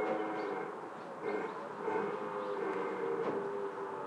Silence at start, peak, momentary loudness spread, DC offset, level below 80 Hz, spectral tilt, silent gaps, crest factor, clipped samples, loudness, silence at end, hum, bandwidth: 0 s; -24 dBFS; 6 LU; under 0.1%; under -90 dBFS; -6.5 dB/octave; none; 14 dB; under 0.1%; -38 LUFS; 0 s; none; 10.5 kHz